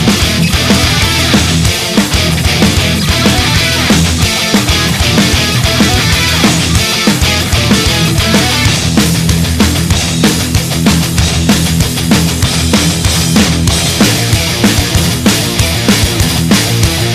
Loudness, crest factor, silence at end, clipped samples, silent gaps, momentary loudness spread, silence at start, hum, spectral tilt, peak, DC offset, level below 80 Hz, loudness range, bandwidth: -9 LUFS; 10 dB; 0 s; under 0.1%; none; 2 LU; 0 s; none; -4 dB/octave; 0 dBFS; under 0.1%; -20 dBFS; 1 LU; 15.5 kHz